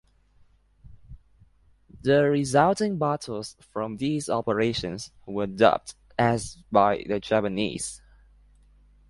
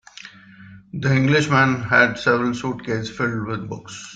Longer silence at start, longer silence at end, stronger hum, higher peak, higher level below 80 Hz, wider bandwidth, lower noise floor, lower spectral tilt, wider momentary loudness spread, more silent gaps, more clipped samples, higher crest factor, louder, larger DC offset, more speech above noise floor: first, 0.85 s vs 0.25 s; first, 1.15 s vs 0 s; first, 50 Hz at -55 dBFS vs none; about the same, -4 dBFS vs -2 dBFS; about the same, -54 dBFS vs -54 dBFS; first, 11.5 kHz vs 9.2 kHz; first, -60 dBFS vs -44 dBFS; about the same, -5.5 dB/octave vs -6 dB/octave; second, 13 LU vs 17 LU; neither; neither; about the same, 22 dB vs 18 dB; second, -25 LUFS vs -19 LUFS; neither; first, 35 dB vs 24 dB